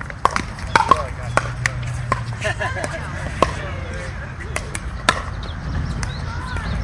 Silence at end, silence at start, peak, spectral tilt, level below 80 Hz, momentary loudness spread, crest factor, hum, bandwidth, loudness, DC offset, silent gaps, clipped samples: 0 s; 0 s; 0 dBFS; -4.5 dB/octave; -32 dBFS; 10 LU; 22 dB; none; 11.5 kHz; -23 LUFS; under 0.1%; none; under 0.1%